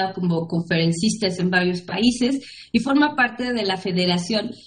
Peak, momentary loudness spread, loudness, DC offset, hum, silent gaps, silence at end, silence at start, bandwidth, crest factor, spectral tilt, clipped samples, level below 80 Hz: -4 dBFS; 5 LU; -21 LUFS; under 0.1%; none; none; 0.1 s; 0 s; 10 kHz; 16 dB; -5 dB/octave; under 0.1%; -54 dBFS